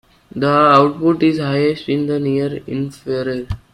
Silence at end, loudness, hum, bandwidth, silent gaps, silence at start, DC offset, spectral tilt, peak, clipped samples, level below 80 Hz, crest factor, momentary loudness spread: 0.15 s; -16 LUFS; none; 11.5 kHz; none; 0.35 s; under 0.1%; -7.5 dB/octave; 0 dBFS; under 0.1%; -44 dBFS; 16 dB; 13 LU